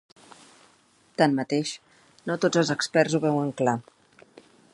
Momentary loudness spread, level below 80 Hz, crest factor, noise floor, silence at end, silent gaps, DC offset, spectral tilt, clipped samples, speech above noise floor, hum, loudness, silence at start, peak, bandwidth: 12 LU; -72 dBFS; 22 dB; -61 dBFS; 0.95 s; none; under 0.1%; -5 dB/octave; under 0.1%; 37 dB; none; -25 LUFS; 1.2 s; -6 dBFS; 11.5 kHz